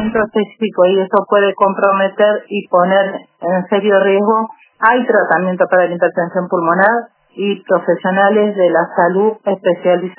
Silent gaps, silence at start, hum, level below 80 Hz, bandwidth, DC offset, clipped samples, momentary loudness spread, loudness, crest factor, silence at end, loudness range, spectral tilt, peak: none; 0 s; none; -56 dBFS; 4 kHz; under 0.1%; under 0.1%; 7 LU; -14 LUFS; 14 dB; 0.05 s; 1 LU; -10 dB/octave; 0 dBFS